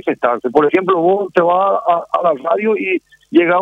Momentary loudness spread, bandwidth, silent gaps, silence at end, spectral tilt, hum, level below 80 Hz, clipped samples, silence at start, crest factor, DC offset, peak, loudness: 4 LU; 5.6 kHz; none; 0 s; -7.5 dB/octave; none; -62 dBFS; under 0.1%; 0.05 s; 14 dB; under 0.1%; 0 dBFS; -15 LUFS